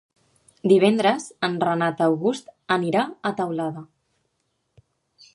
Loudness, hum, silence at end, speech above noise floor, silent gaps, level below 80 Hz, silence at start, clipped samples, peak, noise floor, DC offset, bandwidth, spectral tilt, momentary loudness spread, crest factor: -22 LUFS; none; 1.5 s; 52 dB; none; -70 dBFS; 0.65 s; under 0.1%; -4 dBFS; -73 dBFS; under 0.1%; 11.5 kHz; -6 dB/octave; 11 LU; 20 dB